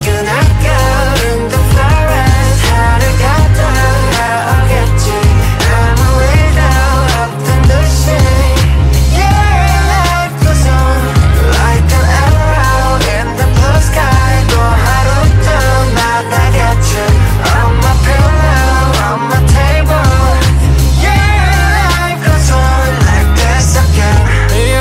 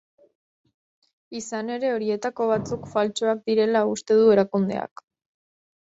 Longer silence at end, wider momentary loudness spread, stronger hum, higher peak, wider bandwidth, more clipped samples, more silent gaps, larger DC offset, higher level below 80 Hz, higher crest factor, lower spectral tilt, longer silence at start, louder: second, 0 s vs 1 s; second, 2 LU vs 14 LU; neither; first, 0 dBFS vs -6 dBFS; first, 16.5 kHz vs 8 kHz; neither; neither; neither; first, -12 dBFS vs -64 dBFS; second, 8 dB vs 18 dB; about the same, -5 dB/octave vs -5.5 dB/octave; second, 0 s vs 1.3 s; first, -10 LUFS vs -23 LUFS